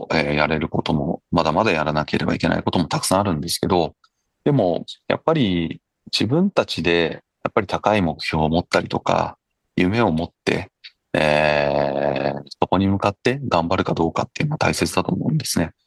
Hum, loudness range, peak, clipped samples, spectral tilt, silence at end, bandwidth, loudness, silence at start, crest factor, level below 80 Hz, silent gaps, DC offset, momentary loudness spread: none; 1 LU; 0 dBFS; under 0.1%; -5.5 dB/octave; 0.15 s; 12.5 kHz; -21 LUFS; 0 s; 20 dB; -44 dBFS; none; under 0.1%; 6 LU